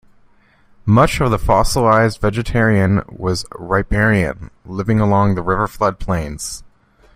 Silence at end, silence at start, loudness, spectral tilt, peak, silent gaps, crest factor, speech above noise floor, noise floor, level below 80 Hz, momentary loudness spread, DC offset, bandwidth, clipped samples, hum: 0.55 s; 0.85 s; -16 LUFS; -6 dB/octave; 0 dBFS; none; 16 dB; 36 dB; -51 dBFS; -30 dBFS; 12 LU; under 0.1%; 15.5 kHz; under 0.1%; none